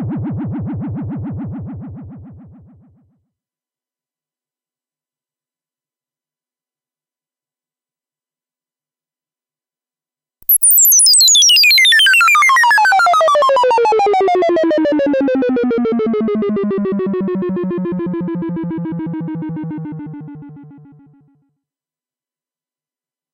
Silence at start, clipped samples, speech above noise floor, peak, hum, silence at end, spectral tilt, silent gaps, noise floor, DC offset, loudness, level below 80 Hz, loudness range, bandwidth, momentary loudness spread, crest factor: 0 s; under 0.1%; over 70 dB; -2 dBFS; none; 2.6 s; -2 dB/octave; none; under -90 dBFS; under 0.1%; -11 LUFS; -52 dBFS; 21 LU; 16 kHz; 20 LU; 14 dB